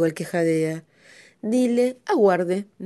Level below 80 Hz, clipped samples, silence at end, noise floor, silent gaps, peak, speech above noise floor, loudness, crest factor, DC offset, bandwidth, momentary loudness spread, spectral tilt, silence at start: -72 dBFS; under 0.1%; 0 s; -51 dBFS; none; -6 dBFS; 30 dB; -22 LUFS; 16 dB; under 0.1%; 12 kHz; 9 LU; -6.5 dB/octave; 0 s